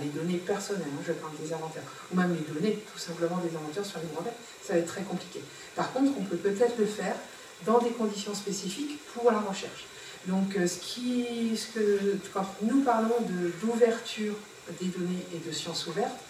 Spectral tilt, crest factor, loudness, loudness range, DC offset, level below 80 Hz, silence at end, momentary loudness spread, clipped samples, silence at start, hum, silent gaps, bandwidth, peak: -5 dB/octave; 20 dB; -31 LUFS; 4 LU; under 0.1%; -74 dBFS; 0 s; 11 LU; under 0.1%; 0 s; none; none; 16 kHz; -10 dBFS